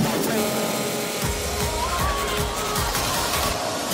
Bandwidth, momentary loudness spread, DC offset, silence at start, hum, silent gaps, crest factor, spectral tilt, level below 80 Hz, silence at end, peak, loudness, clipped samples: 16.5 kHz; 3 LU; under 0.1%; 0 s; none; none; 14 dB; -3 dB/octave; -34 dBFS; 0 s; -8 dBFS; -23 LUFS; under 0.1%